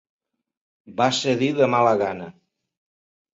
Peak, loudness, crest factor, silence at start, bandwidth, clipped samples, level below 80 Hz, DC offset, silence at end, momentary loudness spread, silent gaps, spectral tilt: -4 dBFS; -20 LUFS; 20 dB; 0.9 s; 8.2 kHz; under 0.1%; -64 dBFS; under 0.1%; 1 s; 17 LU; none; -5 dB/octave